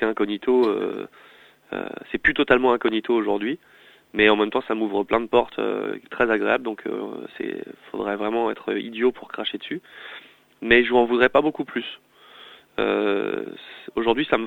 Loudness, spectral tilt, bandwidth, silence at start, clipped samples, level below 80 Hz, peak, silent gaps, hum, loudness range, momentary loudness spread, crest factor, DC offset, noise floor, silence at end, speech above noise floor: -22 LUFS; -6.5 dB/octave; 17 kHz; 0 s; under 0.1%; -54 dBFS; -2 dBFS; none; none; 5 LU; 17 LU; 22 dB; under 0.1%; -47 dBFS; 0 s; 25 dB